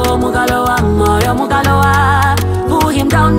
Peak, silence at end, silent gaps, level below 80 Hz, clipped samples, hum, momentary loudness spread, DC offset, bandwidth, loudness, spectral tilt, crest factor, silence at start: 0 dBFS; 0 s; none; -24 dBFS; under 0.1%; none; 3 LU; under 0.1%; 16.5 kHz; -12 LUFS; -5.5 dB/octave; 10 dB; 0 s